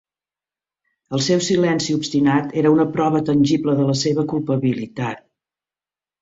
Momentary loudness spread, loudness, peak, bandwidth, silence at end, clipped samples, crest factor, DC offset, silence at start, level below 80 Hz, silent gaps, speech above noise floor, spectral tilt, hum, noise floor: 9 LU; -19 LUFS; -2 dBFS; 8 kHz; 1.05 s; under 0.1%; 16 dB; under 0.1%; 1.1 s; -58 dBFS; none; over 72 dB; -5.5 dB/octave; none; under -90 dBFS